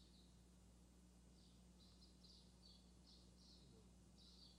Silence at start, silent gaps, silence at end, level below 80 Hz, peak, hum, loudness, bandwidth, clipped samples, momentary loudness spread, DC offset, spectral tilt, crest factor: 0 s; none; 0 s; -72 dBFS; -54 dBFS; none; -68 LUFS; 10.5 kHz; under 0.1%; 3 LU; under 0.1%; -4.5 dB/octave; 14 dB